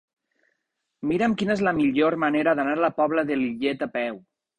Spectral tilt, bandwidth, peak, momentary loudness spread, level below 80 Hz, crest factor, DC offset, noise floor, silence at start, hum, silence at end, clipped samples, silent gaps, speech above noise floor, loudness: -6.5 dB/octave; 9.8 kHz; -8 dBFS; 7 LU; -60 dBFS; 16 dB; under 0.1%; -78 dBFS; 1 s; none; 0.4 s; under 0.1%; none; 55 dB; -24 LUFS